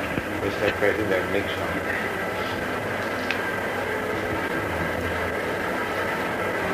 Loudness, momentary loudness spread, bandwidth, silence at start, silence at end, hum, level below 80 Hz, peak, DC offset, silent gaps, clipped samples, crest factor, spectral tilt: -26 LUFS; 4 LU; 15.5 kHz; 0 s; 0 s; none; -50 dBFS; -6 dBFS; under 0.1%; none; under 0.1%; 20 dB; -5 dB/octave